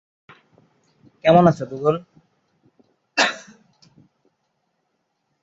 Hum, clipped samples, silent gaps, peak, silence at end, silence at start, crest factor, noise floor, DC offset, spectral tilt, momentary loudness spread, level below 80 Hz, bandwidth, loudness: none; under 0.1%; none; -2 dBFS; 2.05 s; 1.25 s; 22 dB; -73 dBFS; under 0.1%; -5.5 dB/octave; 13 LU; -60 dBFS; 8 kHz; -19 LUFS